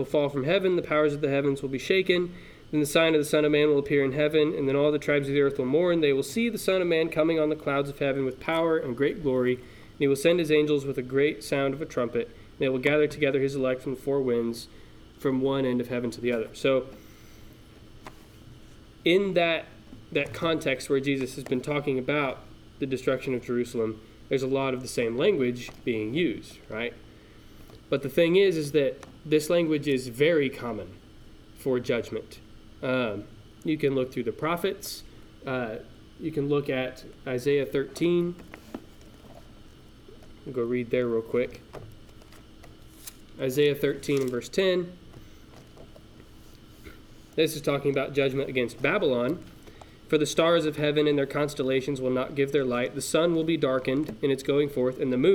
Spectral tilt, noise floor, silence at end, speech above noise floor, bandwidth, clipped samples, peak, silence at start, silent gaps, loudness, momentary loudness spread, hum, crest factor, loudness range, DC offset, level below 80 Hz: -5.5 dB/octave; -50 dBFS; 0 s; 24 dB; 18.5 kHz; under 0.1%; -6 dBFS; 0 s; none; -26 LUFS; 12 LU; none; 20 dB; 7 LU; under 0.1%; -54 dBFS